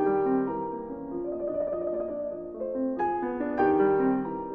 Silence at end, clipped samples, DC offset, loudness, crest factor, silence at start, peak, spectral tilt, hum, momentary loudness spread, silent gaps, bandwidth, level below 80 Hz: 0 s; under 0.1%; under 0.1%; -29 LUFS; 16 dB; 0 s; -12 dBFS; -10.5 dB/octave; none; 11 LU; none; 3.4 kHz; -58 dBFS